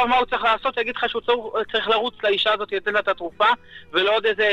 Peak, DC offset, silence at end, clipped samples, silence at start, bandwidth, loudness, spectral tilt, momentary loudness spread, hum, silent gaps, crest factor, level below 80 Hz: -6 dBFS; under 0.1%; 0 s; under 0.1%; 0 s; 9 kHz; -21 LUFS; -4 dB/octave; 5 LU; none; none; 16 dB; -52 dBFS